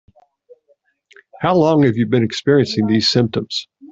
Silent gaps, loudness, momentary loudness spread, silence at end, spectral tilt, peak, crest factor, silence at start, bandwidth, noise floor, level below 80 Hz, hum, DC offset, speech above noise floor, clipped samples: none; -16 LUFS; 9 LU; 0.05 s; -6 dB/octave; -2 dBFS; 16 dB; 1.4 s; 8 kHz; -61 dBFS; -56 dBFS; none; under 0.1%; 45 dB; under 0.1%